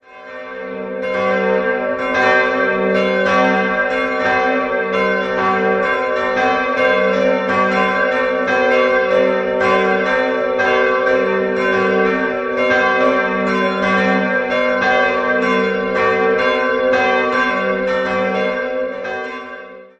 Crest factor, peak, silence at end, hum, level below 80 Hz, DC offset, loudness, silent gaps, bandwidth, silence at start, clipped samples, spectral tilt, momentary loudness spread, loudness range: 14 dB; -2 dBFS; 0.15 s; none; -50 dBFS; under 0.1%; -16 LUFS; none; 8.2 kHz; 0.1 s; under 0.1%; -5.5 dB/octave; 6 LU; 1 LU